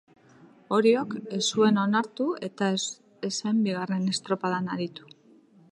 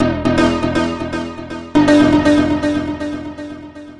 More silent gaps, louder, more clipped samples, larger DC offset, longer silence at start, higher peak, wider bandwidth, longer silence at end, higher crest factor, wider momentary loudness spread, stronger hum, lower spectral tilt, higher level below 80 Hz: neither; second, -27 LUFS vs -15 LUFS; neither; neither; first, 0.7 s vs 0 s; second, -10 dBFS vs -2 dBFS; about the same, 11 kHz vs 11 kHz; first, 0.75 s vs 0 s; about the same, 18 dB vs 14 dB; second, 11 LU vs 18 LU; neither; second, -4.5 dB/octave vs -6 dB/octave; second, -76 dBFS vs -38 dBFS